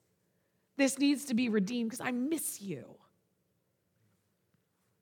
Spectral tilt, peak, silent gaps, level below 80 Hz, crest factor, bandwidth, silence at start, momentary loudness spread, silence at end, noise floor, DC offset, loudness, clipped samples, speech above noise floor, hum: -4 dB/octave; -16 dBFS; none; -86 dBFS; 20 dB; 19 kHz; 0.8 s; 14 LU; 2.05 s; -78 dBFS; under 0.1%; -32 LUFS; under 0.1%; 45 dB; none